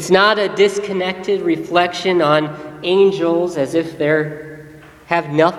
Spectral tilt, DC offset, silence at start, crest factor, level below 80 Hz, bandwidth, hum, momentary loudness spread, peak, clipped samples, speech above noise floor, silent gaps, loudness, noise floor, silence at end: -5 dB/octave; under 0.1%; 0 s; 16 dB; -56 dBFS; 13 kHz; none; 8 LU; 0 dBFS; under 0.1%; 23 dB; none; -16 LUFS; -39 dBFS; 0 s